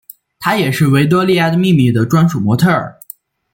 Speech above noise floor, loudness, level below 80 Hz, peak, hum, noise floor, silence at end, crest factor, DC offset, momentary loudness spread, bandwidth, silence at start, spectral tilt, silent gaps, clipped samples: 27 dB; -13 LUFS; -50 dBFS; -2 dBFS; none; -39 dBFS; 0.65 s; 12 dB; under 0.1%; 6 LU; 17 kHz; 0.4 s; -6.5 dB/octave; none; under 0.1%